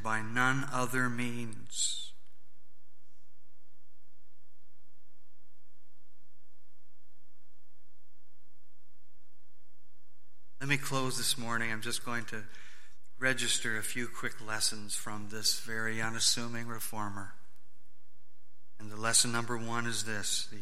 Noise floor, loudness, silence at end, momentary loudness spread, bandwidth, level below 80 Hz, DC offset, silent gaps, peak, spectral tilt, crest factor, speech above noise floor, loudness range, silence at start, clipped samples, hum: -73 dBFS; -33 LUFS; 0 s; 13 LU; 16.5 kHz; -70 dBFS; 2%; none; -12 dBFS; -2 dB/octave; 26 dB; 39 dB; 7 LU; 0 s; under 0.1%; none